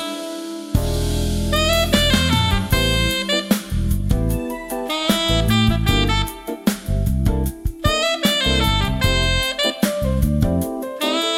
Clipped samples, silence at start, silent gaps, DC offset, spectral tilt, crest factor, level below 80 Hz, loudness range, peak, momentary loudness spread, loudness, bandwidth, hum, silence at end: under 0.1%; 0 s; none; under 0.1%; -4.5 dB/octave; 16 dB; -26 dBFS; 2 LU; -4 dBFS; 8 LU; -19 LUFS; 16.5 kHz; none; 0 s